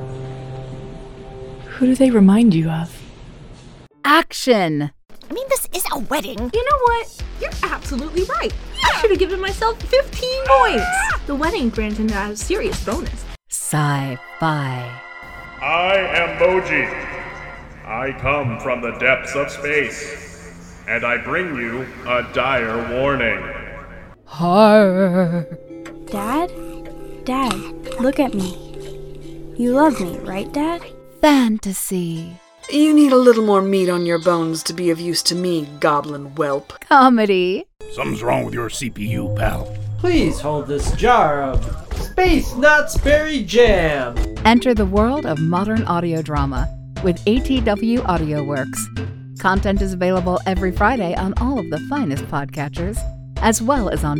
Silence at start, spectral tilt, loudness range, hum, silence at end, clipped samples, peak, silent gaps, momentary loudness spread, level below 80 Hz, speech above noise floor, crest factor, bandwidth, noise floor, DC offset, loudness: 0 s; -5 dB/octave; 6 LU; none; 0 s; under 0.1%; 0 dBFS; none; 18 LU; -32 dBFS; 25 dB; 18 dB; 19.5 kHz; -42 dBFS; under 0.1%; -18 LUFS